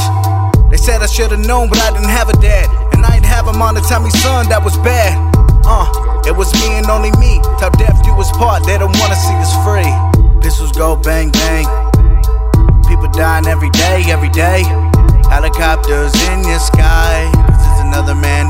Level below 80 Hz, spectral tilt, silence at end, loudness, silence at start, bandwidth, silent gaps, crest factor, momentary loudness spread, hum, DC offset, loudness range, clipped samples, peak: -10 dBFS; -5 dB/octave; 0 s; -11 LUFS; 0 s; 16.5 kHz; none; 8 dB; 3 LU; none; under 0.1%; 1 LU; under 0.1%; 0 dBFS